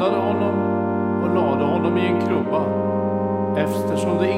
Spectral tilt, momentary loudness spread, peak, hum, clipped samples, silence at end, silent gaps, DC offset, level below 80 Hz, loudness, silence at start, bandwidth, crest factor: -7.5 dB/octave; 2 LU; -6 dBFS; none; under 0.1%; 0 s; none; under 0.1%; -64 dBFS; -21 LUFS; 0 s; 15.5 kHz; 14 dB